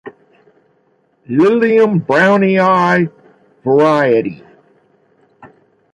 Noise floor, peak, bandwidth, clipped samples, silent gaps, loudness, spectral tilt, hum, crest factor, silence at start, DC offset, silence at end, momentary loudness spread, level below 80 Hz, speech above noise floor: -58 dBFS; 0 dBFS; 10 kHz; under 0.1%; none; -12 LUFS; -7.5 dB/octave; none; 14 dB; 0.05 s; under 0.1%; 0.5 s; 9 LU; -58 dBFS; 46 dB